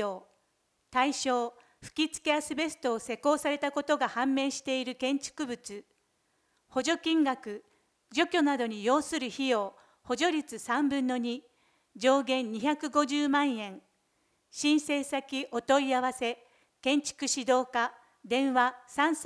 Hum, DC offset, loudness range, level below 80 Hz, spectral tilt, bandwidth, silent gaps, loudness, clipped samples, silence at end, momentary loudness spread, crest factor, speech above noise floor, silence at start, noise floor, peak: none; under 0.1%; 3 LU; -72 dBFS; -2.5 dB/octave; 11 kHz; none; -30 LUFS; under 0.1%; 0 s; 10 LU; 20 dB; 45 dB; 0 s; -75 dBFS; -12 dBFS